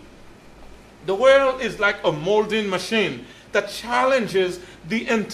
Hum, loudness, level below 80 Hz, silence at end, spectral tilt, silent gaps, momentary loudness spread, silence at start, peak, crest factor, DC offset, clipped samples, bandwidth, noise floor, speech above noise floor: none; -21 LUFS; -52 dBFS; 0 s; -4.5 dB/octave; none; 11 LU; 0 s; -4 dBFS; 18 dB; under 0.1%; under 0.1%; 14 kHz; -45 dBFS; 24 dB